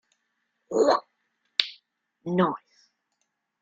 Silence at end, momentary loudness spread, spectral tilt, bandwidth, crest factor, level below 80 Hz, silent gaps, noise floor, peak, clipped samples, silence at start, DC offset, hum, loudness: 1.05 s; 15 LU; -5 dB/octave; 7.8 kHz; 30 dB; -72 dBFS; none; -78 dBFS; 0 dBFS; under 0.1%; 0.7 s; under 0.1%; none; -26 LUFS